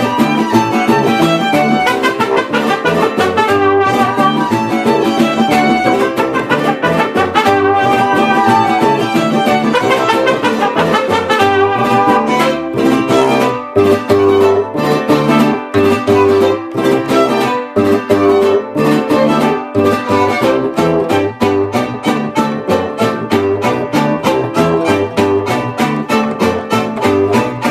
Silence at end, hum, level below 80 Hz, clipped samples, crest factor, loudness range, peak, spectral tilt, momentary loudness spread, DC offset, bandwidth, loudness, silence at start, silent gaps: 0 s; none; -48 dBFS; under 0.1%; 12 dB; 3 LU; 0 dBFS; -5.5 dB/octave; 4 LU; under 0.1%; 14 kHz; -12 LUFS; 0 s; none